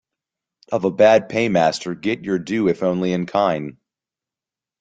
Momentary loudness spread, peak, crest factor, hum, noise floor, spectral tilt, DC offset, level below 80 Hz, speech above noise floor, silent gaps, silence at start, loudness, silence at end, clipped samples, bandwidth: 10 LU; -2 dBFS; 20 dB; none; -89 dBFS; -6 dB/octave; under 0.1%; -58 dBFS; 71 dB; none; 0.7 s; -19 LUFS; 1.1 s; under 0.1%; 9.2 kHz